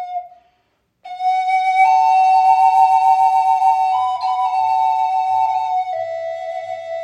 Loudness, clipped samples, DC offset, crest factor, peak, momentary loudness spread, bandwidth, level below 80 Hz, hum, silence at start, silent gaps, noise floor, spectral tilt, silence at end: -15 LUFS; under 0.1%; under 0.1%; 14 dB; -2 dBFS; 14 LU; 9.8 kHz; -76 dBFS; none; 0 s; none; -65 dBFS; -0.5 dB/octave; 0 s